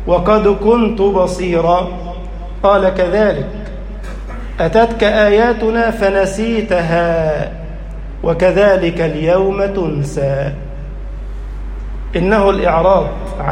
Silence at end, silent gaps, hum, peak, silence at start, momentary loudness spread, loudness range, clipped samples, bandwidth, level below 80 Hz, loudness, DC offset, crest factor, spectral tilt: 0 s; none; none; 0 dBFS; 0 s; 17 LU; 4 LU; under 0.1%; 10.5 kHz; -26 dBFS; -14 LUFS; under 0.1%; 14 dB; -6.5 dB/octave